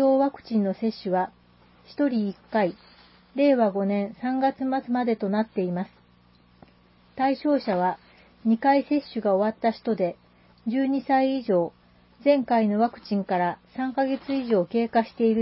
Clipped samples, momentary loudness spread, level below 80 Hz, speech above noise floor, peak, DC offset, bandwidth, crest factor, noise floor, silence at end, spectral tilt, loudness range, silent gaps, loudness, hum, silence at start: under 0.1%; 8 LU; -66 dBFS; 34 dB; -10 dBFS; under 0.1%; 5.8 kHz; 16 dB; -58 dBFS; 0 s; -11 dB/octave; 3 LU; none; -25 LUFS; 60 Hz at -55 dBFS; 0 s